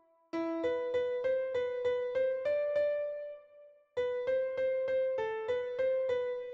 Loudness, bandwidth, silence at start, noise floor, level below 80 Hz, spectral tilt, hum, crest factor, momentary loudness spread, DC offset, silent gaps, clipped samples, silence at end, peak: -34 LUFS; 6.8 kHz; 0.35 s; -59 dBFS; -72 dBFS; -5.5 dB/octave; none; 10 dB; 7 LU; under 0.1%; none; under 0.1%; 0 s; -22 dBFS